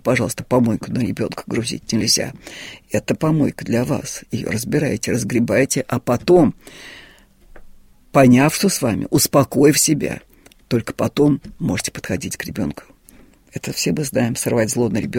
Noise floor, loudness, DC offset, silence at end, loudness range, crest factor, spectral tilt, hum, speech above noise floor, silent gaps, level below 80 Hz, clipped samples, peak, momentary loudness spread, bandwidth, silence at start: -48 dBFS; -18 LUFS; under 0.1%; 0 s; 6 LU; 18 dB; -4.5 dB/octave; none; 30 dB; none; -46 dBFS; under 0.1%; -2 dBFS; 13 LU; 16.5 kHz; 0.05 s